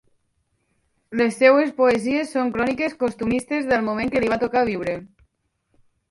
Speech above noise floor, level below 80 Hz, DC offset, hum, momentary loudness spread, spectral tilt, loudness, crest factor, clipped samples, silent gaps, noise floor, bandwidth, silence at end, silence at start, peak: 50 dB; -52 dBFS; under 0.1%; none; 9 LU; -5.5 dB/octave; -21 LUFS; 20 dB; under 0.1%; none; -70 dBFS; 11.5 kHz; 1.05 s; 1.1 s; -2 dBFS